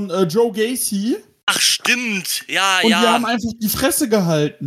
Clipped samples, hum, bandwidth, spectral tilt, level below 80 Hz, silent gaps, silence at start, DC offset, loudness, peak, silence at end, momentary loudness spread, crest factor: under 0.1%; none; 16.5 kHz; -3 dB/octave; -50 dBFS; 1.43-1.47 s; 0 s; under 0.1%; -17 LUFS; -2 dBFS; 0 s; 7 LU; 16 dB